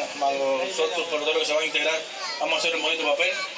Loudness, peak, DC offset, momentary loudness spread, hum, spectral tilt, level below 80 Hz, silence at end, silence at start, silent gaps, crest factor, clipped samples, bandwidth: -24 LUFS; -10 dBFS; under 0.1%; 4 LU; none; -0.5 dB/octave; -84 dBFS; 0 s; 0 s; none; 16 dB; under 0.1%; 8 kHz